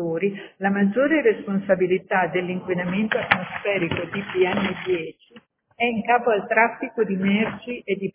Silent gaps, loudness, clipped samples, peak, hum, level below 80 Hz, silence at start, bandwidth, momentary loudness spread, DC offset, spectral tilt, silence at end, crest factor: none; -22 LUFS; under 0.1%; 0 dBFS; none; -58 dBFS; 0 s; 4 kHz; 7 LU; under 0.1%; -10 dB/octave; 0.05 s; 22 dB